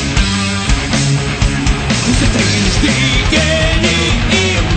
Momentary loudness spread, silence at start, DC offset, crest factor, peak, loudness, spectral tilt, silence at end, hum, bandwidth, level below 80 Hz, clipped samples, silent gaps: 3 LU; 0 s; under 0.1%; 12 dB; 0 dBFS; -12 LUFS; -4 dB/octave; 0 s; none; 9.2 kHz; -18 dBFS; under 0.1%; none